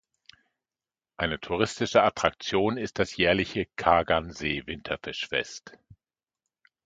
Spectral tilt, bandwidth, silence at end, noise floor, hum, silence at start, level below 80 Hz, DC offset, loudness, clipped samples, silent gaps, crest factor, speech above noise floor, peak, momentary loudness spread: -4.5 dB/octave; 9.2 kHz; 1.15 s; under -90 dBFS; none; 1.2 s; -52 dBFS; under 0.1%; -27 LUFS; under 0.1%; none; 26 dB; over 63 dB; -4 dBFS; 10 LU